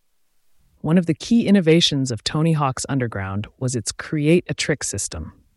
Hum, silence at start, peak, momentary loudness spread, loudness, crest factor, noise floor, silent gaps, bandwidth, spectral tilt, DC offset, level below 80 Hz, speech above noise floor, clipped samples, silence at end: none; 0.85 s; -4 dBFS; 11 LU; -20 LUFS; 16 dB; -60 dBFS; none; 12 kHz; -5 dB/octave; under 0.1%; -48 dBFS; 40 dB; under 0.1%; 0.25 s